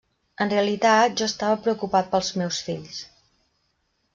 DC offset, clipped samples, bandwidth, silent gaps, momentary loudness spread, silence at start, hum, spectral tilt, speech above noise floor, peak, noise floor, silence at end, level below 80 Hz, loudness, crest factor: under 0.1%; under 0.1%; 7.6 kHz; none; 13 LU; 0.4 s; none; -4 dB/octave; 49 dB; -6 dBFS; -71 dBFS; 1.1 s; -62 dBFS; -23 LUFS; 18 dB